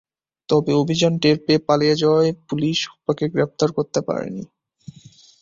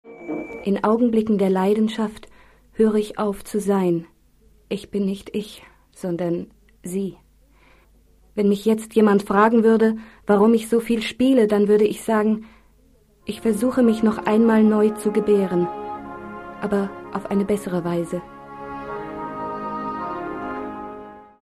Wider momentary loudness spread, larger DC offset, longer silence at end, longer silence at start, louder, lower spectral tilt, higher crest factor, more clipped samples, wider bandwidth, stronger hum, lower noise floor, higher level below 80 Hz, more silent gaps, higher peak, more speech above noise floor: second, 8 LU vs 16 LU; neither; first, 0.95 s vs 0.2 s; first, 0.5 s vs 0.05 s; about the same, -19 LUFS vs -21 LUFS; second, -5.5 dB/octave vs -7 dB/octave; about the same, 18 dB vs 16 dB; neither; second, 7.6 kHz vs 13.5 kHz; neither; second, -48 dBFS vs -56 dBFS; about the same, -58 dBFS vs -54 dBFS; neither; first, -2 dBFS vs -6 dBFS; second, 29 dB vs 36 dB